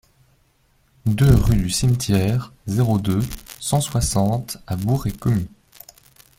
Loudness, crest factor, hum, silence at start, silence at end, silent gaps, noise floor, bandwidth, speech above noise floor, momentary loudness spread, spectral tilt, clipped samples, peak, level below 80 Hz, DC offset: -20 LUFS; 18 dB; none; 1.05 s; 0.9 s; none; -61 dBFS; 16.5 kHz; 42 dB; 11 LU; -6 dB/octave; under 0.1%; -2 dBFS; -32 dBFS; under 0.1%